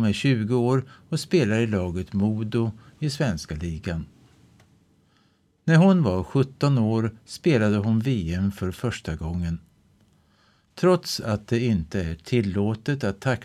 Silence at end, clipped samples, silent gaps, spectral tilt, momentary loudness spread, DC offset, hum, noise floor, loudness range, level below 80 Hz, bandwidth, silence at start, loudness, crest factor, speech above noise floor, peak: 0 s; under 0.1%; none; -7 dB/octave; 10 LU; under 0.1%; none; -64 dBFS; 6 LU; -46 dBFS; 13.5 kHz; 0 s; -24 LUFS; 18 dB; 40 dB; -8 dBFS